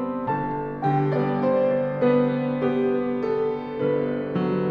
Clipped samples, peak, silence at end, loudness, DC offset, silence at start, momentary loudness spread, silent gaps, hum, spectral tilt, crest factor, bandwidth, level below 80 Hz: under 0.1%; -10 dBFS; 0 s; -24 LUFS; under 0.1%; 0 s; 5 LU; none; none; -10 dB/octave; 14 dB; 5.4 kHz; -54 dBFS